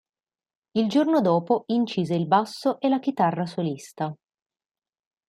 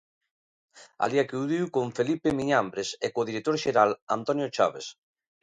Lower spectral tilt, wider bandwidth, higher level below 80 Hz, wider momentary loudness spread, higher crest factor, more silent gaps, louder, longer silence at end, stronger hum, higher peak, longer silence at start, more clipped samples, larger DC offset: first, -7 dB/octave vs -5 dB/octave; first, 13 kHz vs 10.5 kHz; second, -72 dBFS vs -64 dBFS; first, 10 LU vs 7 LU; about the same, 20 dB vs 20 dB; second, none vs 4.02-4.07 s; first, -24 LUFS vs -27 LUFS; first, 1.15 s vs 0.5 s; neither; about the same, -6 dBFS vs -8 dBFS; about the same, 0.75 s vs 0.75 s; neither; neither